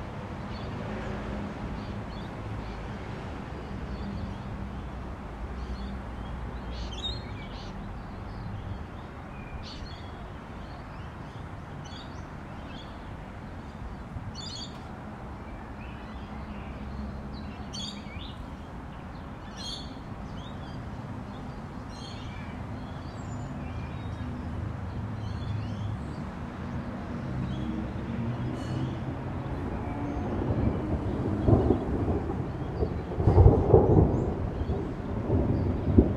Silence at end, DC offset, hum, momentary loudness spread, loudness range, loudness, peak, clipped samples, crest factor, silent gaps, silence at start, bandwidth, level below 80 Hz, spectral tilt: 0 s; under 0.1%; none; 14 LU; 15 LU; -33 LUFS; -2 dBFS; under 0.1%; 30 dB; none; 0 s; 9.8 kHz; -38 dBFS; -7.5 dB/octave